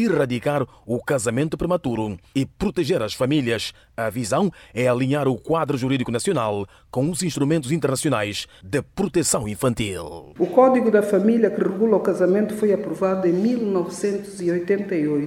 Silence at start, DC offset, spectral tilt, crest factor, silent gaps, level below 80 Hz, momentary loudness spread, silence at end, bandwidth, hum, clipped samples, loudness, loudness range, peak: 0 s; under 0.1%; -5.5 dB/octave; 18 dB; none; -50 dBFS; 9 LU; 0 s; 17 kHz; none; under 0.1%; -22 LUFS; 4 LU; -2 dBFS